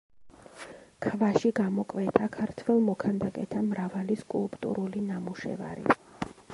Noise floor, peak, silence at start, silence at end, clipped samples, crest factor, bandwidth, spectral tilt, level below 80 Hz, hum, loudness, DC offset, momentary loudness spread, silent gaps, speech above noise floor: -51 dBFS; -4 dBFS; 0.2 s; 0 s; under 0.1%; 26 dB; 11.5 kHz; -7.5 dB/octave; -62 dBFS; none; -30 LUFS; under 0.1%; 11 LU; none; 22 dB